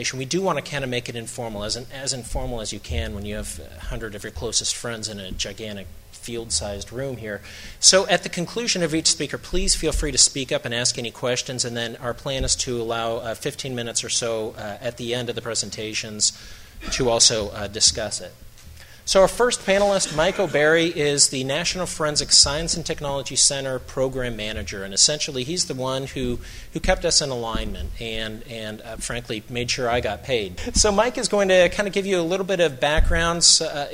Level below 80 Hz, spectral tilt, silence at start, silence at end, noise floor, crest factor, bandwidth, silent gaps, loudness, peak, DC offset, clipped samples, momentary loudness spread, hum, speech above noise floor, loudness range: -36 dBFS; -2 dB/octave; 0 s; 0 s; -43 dBFS; 22 dB; 16 kHz; none; -21 LUFS; 0 dBFS; under 0.1%; under 0.1%; 15 LU; none; 20 dB; 9 LU